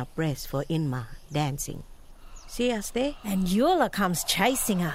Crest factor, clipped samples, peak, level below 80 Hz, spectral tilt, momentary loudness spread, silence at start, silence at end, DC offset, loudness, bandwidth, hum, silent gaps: 18 dB; under 0.1%; -8 dBFS; -44 dBFS; -4.5 dB/octave; 11 LU; 0 s; 0 s; under 0.1%; -27 LUFS; 16 kHz; none; none